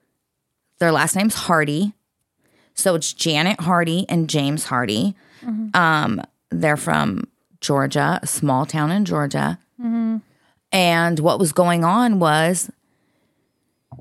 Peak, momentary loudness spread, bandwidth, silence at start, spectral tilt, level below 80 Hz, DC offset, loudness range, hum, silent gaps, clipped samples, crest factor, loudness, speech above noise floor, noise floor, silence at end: -2 dBFS; 10 LU; 16 kHz; 0.8 s; -4.5 dB/octave; -60 dBFS; under 0.1%; 3 LU; none; none; under 0.1%; 18 dB; -19 LUFS; 57 dB; -76 dBFS; 0 s